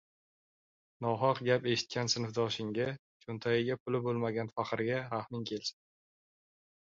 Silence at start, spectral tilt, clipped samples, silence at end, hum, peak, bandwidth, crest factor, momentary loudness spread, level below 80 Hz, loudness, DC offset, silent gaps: 1 s; -4 dB/octave; under 0.1%; 1.2 s; none; -14 dBFS; 7.6 kHz; 20 dB; 8 LU; -72 dBFS; -34 LUFS; under 0.1%; 2.99-3.20 s, 3.80-3.86 s